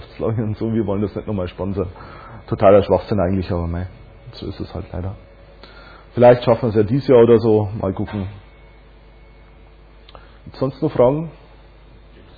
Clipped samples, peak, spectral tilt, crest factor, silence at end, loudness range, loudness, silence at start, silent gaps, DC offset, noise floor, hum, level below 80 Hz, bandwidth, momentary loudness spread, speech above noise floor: under 0.1%; -2 dBFS; -10.5 dB/octave; 18 dB; 1.05 s; 9 LU; -18 LUFS; 0 s; none; under 0.1%; -45 dBFS; none; -42 dBFS; 4.9 kHz; 19 LU; 28 dB